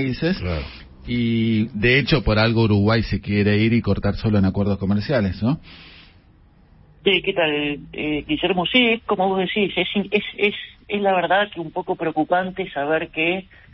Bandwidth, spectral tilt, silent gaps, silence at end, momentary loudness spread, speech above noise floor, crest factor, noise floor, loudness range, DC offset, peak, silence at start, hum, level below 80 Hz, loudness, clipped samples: 5.8 kHz; -10.5 dB/octave; none; 0.3 s; 9 LU; 32 dB; 18 dB; -52 dBFS; 5 LU; under 0.1%; -2 dBFS; 0 s; none; -40 dBFS; -20 LUFS; under 0.1%